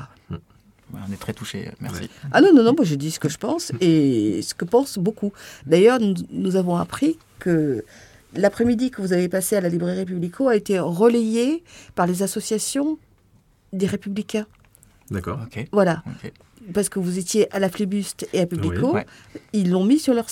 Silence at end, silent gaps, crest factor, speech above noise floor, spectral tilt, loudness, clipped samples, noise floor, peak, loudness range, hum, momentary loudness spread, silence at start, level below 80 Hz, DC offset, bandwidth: 0 s; none; 18 dB; 37 dB; -5.5 dB/octave; -21 LUFS; under 0.1%; -57 dBFS; -2 dBFS; 7 LU; none; 15 LU; 0 s; -54 dBFS; under 0.1%; 17 kHz